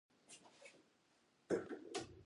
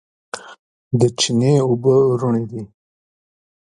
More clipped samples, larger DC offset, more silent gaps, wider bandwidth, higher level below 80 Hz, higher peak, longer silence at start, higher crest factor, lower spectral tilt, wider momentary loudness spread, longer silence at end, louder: neither; neither; second, none vs 0.59-0.91 s; about the same, 11.5 kHz vs 11.5 kHz; second, -78 dBFS vs -58 dBFS; second, -26 dBFS vs -2 dBFS; about the same, 0.3 s vs 0.35 s; first, 24 dB vs 16 dB; second, -4.5 dB/octave vs -6 dB/octave; about the same, 19 LU vs 19 LU; second, 0 s vs 0.95 s; second, -46 LUFS vs -17 LUFS